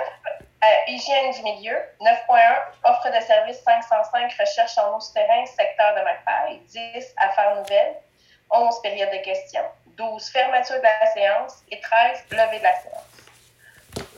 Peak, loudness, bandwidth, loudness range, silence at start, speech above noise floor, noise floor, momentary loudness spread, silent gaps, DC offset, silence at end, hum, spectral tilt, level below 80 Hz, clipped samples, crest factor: -4 dBFS; -20 LUFS; 11.5 kHz; 4 LU; 0 s; 32 dB; -52 dBFS; 14 LU; none; under 0.1%; 0.1 s; none; -2 dB/octave; -66 dBFS; under 0.1%; 18 dB